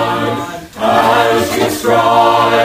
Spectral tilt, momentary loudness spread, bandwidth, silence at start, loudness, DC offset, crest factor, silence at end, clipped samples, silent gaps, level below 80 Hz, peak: -4 dB/octave; 9 LU; 15.5 kHz; 0 s; -12 LUFS; under 0.1%; 12 dB; 0 s; under 0.1%; none; -46 dBFS; 0 dBFS